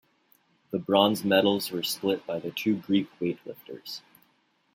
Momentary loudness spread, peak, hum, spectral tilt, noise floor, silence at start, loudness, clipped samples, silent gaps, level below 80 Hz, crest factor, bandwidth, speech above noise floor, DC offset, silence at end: 17 LU; -6 dBFS; none; -4.5 dB/octave; -69 dBFS; 0.7 s; -27 LUFS; under 0.1%; none; -72 dBFS; 22 dB; 16.5 kHz; 42 dB; under 0.1%; 0.75 s